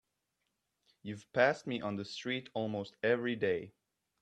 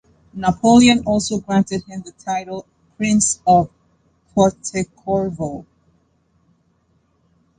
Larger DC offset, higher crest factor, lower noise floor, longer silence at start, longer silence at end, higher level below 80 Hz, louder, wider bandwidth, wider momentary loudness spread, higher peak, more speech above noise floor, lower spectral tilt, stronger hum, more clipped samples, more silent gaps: neither; first, 24 dB vs 18 dB; first, -84 dBFS vs -62 dBFS; first, 1.05 s vs 0.35 s; second, 0.5 s vs 1.95 s; second, -78 dBFS vs -46 dBFS; second, -35 LUFS vs -18 LUFS; about the same, 9.4 kHz vs 9.8 kHz; about the same, 16 LU vs 18 LU; second, -14 dBFS vs -2 dBFS; first, 49 dB vs 45 dB; about the same, -5.5 dB/octave vs -4.5 dB/octave; neither; neither; neither